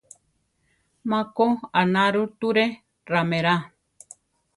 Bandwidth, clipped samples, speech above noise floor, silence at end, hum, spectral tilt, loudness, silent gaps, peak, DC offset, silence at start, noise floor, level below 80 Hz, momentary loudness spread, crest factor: 11.5 kHz; under 0.1%; 48 dB; 0.9 s; none; -6 dB/octave; -23 LUFS; none; -4 dBFS; under 0.1%; 1.05 s; -70 dBFS; -66 dBFS; 6 LU; 20 dB